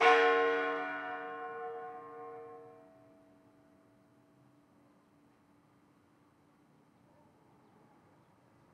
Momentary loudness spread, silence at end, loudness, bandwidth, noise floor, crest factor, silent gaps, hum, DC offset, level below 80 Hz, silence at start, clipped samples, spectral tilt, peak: 24 LU; 6 s; -34 LUFS; 9 kHz; -67 dBFS; 24 dB; none; none; under 0.1%; under -90 dBFS; 0 s; under 0.1%; -3 dB/octave; -12 dBFS